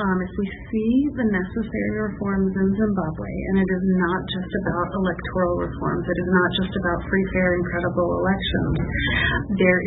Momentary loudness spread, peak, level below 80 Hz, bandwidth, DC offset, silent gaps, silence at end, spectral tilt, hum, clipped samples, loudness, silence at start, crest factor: 6 LU; -6 dBFS; -36 dBFS; 4.1 kHz; under 0.1%; none; 0 s; -11.5 dB/octave; none; under 0.1%; -23 LUFS; 0 s; 16 dB